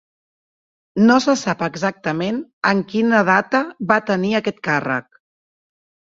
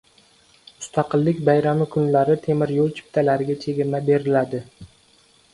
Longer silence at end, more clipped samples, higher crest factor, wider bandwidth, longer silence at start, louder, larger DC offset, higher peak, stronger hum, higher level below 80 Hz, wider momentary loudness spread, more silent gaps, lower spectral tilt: first, 1.15 s vs 0.65 s; neither; about the same, 20 dB vs 18 dB; second, 7.8 kHz vs 11.5 kHz; first, 0.95 s vs 0.8 s; first, -18 LUFS vs -21 LUFS; neither; first, 0 dBFS vs -4 dBFS; neither; about the same, -62 dBFS vs -58 dBFS; about the same, 8 LU vs 7 LU; first, 2.53-2.62 s vs none; second, -5.5 dB/octave vs -7.5 dB/octave